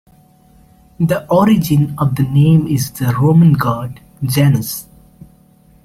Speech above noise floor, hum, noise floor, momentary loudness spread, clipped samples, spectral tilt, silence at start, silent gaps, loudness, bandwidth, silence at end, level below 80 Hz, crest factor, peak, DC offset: 35 dB; none; -48 dBFS; 13 LU; under 0.1%; -7 dB/octave; 1 s; none; -14 LUFS; 16 kHz; 1 s; -44 dBFS; 14 dB; -2 dBFS; under 0.1%